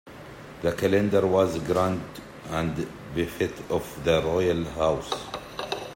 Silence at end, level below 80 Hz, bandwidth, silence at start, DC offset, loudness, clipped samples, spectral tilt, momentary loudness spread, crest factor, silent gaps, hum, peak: 0 s; -50 dBFS; 16.5 kHz; 0.05 s; under 0.1%; -26 LUFS; under 0.1%; -6 dB/octave; 13 LU; 20 dB; none; none; -8 dBFS